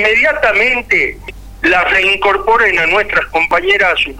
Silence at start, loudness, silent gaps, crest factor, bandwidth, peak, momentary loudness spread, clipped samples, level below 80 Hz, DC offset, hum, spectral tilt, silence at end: 0 s; -11 LUFS; none; 10 dB; 19.5 kHz; -2 dBFS; 3 LU; under 0.1%; -36 dBFS; 0.3%; none; -3.5 dB/octave; 0 s